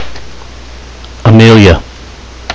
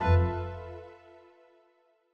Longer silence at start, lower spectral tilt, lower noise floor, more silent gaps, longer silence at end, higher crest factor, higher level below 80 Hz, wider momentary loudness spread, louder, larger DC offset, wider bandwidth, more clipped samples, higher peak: about the same, 0 s vs 0 s; second, -6.5 dB/octave vs -9 dB/octave; second, -29 dBFS vs -68 dBFS; neither; second, 0 s vs 1.2 s; second, 8 dB vs 18 dB; first, -22 dBFS vs -42 dBFS; about the same, 26 LU vs 25 LU; first, -5 LUFS vs -31 LUFS; neither; first, 8 kHz vs 5.8 kHz; first, 4% vs under 0.1%; first, 0 dBFS vs -12 dBFS